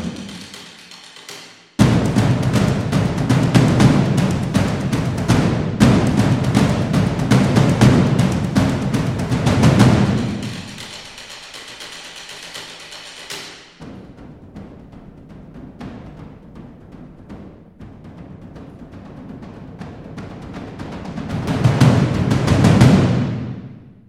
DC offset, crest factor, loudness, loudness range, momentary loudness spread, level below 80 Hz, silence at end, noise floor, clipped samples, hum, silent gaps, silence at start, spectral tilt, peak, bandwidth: under 0.1%; 18 dB; -16 LUFS; 22 LU; 25 LU; -36 dBFS; 0.3 s; -40 dBFS; under 0.1%; none; none; 0 s; -6.5 dB/octave; 0 dBFS; 14 kHz